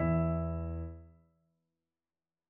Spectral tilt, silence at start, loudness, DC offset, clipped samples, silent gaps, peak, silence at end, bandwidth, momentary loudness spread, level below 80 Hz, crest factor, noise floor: -11.5 dB/octave; 0 s; -35 LUFS; under 0.1%; under 0.1%; none; -20 dBFS; 1.4 s; 2.8 kHz; 16 LU; -46 dBFS; 18 dB; under -90 dBFS